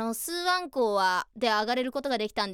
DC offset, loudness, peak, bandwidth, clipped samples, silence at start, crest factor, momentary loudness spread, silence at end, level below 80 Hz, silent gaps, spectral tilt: under 0.1%; -27 LUFS; -12 dBFS; 19.5 kHz; under 0.1%; 0 s; 16 dB; 4 LU; 0 s; -64 dBFS; none; -2.5 dB/octave